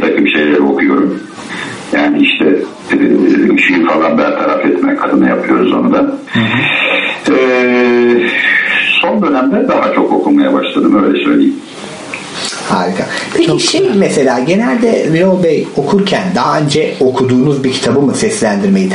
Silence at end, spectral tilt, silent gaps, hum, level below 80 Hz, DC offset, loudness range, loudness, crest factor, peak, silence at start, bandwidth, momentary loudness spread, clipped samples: 0 s; -5 dB/octave; none; none; -50 dBFS; under 0.1%; 3 LU; -10 LUFS; 10 dB; 0 dBFS; 0 s; 11 kHz; 6 LU; under 0.1%